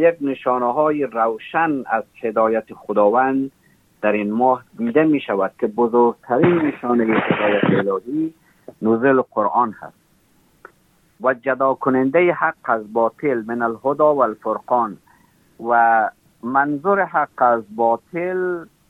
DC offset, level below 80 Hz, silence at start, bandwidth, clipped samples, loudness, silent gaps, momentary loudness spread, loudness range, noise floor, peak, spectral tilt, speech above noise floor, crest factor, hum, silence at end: under 0.1%; -66 dBFS; 0 s; 4.1 kHz; under 0.1%; -19 LUFS; none; 8 LU; 3 LU; -58 dBFS; -4 dBFS; -8.5 dB/octave; 40 dB; 16 dB; none; 0.25 s